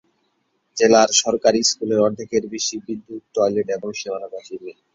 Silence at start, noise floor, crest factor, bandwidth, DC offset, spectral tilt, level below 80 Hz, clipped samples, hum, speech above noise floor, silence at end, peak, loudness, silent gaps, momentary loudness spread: 0.75 s; -69 dBFS; 20 dB; 7.8 kHz; under 0.1%; -2.5 dB/octave; -60 dBFS; under 0.1%; none; 49 dB; 0.25 s; 0 dBFS; -19 LUFS; none; 18 LU